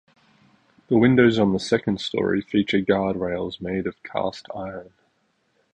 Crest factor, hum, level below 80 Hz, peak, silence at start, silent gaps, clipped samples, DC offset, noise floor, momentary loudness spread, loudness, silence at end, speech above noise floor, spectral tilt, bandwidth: 20 dB; none; -52 dBFS; -4 dBFS; 0.9 s; none; under 0.1%; under 0.1%; -68 dBFS; 16 LU; -22 LUFS; 0.9 s; 46 dB; -6.5 dB/octave; 9.6 kHz